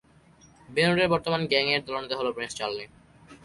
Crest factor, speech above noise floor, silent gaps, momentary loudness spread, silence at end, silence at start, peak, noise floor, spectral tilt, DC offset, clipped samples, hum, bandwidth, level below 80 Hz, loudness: 18 dB; 30 dB; none; 10 LU; 0.1 s; 0.7 s; -10 dBFS; -57 dBFS; -4.5 dB/octave; under 0.1%; under 0.1%; none; 11.5 kHz; -58 dBFS; -26 LUFS